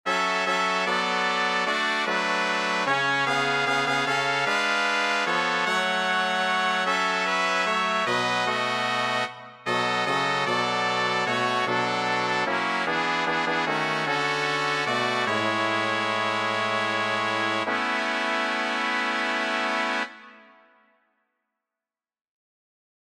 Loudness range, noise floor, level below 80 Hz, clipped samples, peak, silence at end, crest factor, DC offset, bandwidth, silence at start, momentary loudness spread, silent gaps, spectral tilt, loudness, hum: 3 LU; under -90 dBFS; -78 dBFS; under 0.1%; -8 dBFS; 2.65 s; 18 dB; under 0.1%; 15 kHz; 0.05 s; 2 LU; none; -3 dB/octave; -24 LUFS; none